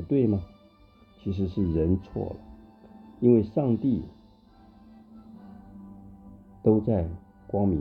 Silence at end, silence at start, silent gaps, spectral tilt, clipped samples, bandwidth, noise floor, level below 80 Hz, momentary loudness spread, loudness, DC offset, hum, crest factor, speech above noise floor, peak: 0 s; 0 s; none; -12 dB/octave; under 0.1%; 5 kHz; -56 dBFS; -46 dBFS; 25 LU; -26 LUFS; under 0.1%; none; 20 dB; 32 dB; -8 dBFS